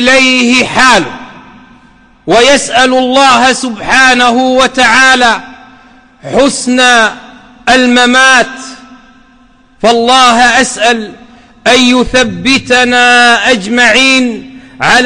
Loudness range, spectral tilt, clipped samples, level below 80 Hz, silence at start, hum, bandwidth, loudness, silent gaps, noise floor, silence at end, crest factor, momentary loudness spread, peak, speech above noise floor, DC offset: 2 LU; -2 dB/octave; 0.3%; -36 dBFS; 0 s; none; 11.5 kHz; -6 LUFS; none; -43 dBFS; 0 s; 8 dB; 11 LU; 0 dBFS; 36 dB; under 0.1%